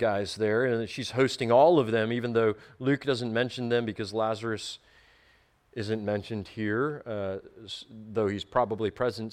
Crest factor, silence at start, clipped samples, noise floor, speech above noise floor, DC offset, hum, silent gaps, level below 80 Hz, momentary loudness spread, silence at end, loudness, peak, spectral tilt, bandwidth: 18 dB; 0 s; under 0.1%; -64 dBFS; 36 dB; under 0.1%; none; none; -62 dBFS; 14 LU; 0 s; -28 LUFS; -10 dBFS; -6 dB/octave; 13 kHz